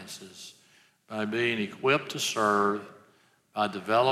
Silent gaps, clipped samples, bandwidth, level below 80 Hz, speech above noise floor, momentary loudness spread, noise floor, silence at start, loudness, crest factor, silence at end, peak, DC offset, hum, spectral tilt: none; under 0.1%; 16 kHz; -80 dBFS; 36 dB; 20 LU; -64 dBFS; 0 s; -28 LUFS; 18 dB; 0 s; -10 dBFS; under 0.1%; none; -3.5 dB/octave